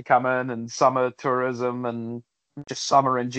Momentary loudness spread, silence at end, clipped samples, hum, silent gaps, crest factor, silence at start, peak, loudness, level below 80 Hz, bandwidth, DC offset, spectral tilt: 15 LU; 0 s; under 0.1%; none; none; 20 dB; 0 s; -4 dBFS; -23 LUFS; -74 dBFS; 8.8 kHz; under 0.1%; -4.5 dB/octave